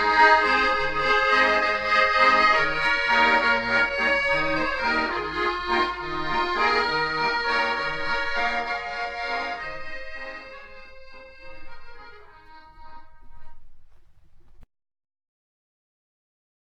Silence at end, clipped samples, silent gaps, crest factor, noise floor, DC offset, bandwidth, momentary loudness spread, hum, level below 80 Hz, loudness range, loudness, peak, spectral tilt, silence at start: 2.1 s; under 0.1%; none; 20 dB; -48 dBFS; under 0.1%; 9.8 kHz; 14 LU; none; -46 dBFS; 15 LU; -21 LUFS; -4 dBFS; -3.5 dB/octave; 0 s